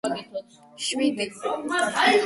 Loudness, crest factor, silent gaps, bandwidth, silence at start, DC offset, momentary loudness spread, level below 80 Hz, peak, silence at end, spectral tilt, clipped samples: -25 LUFS; 18 dB; none; 11.5 kHz; 0.05 s; under 0.1%; 14 LU; -68 dBFS; -8 dBFS; 0 s; -2.5 dB/octave; under 0.1%